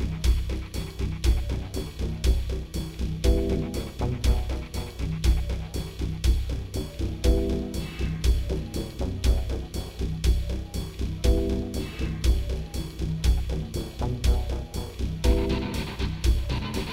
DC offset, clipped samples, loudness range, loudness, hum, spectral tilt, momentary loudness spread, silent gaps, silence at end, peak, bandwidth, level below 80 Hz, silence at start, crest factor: under 0.1%; under 0.1%; 1 LU; -29 LUFS; none; -6 dB/octave; 8 LU; none; 0 s; -10 dBFS; 15.5 kHz; -28 dBFS; 0 s; 16 dB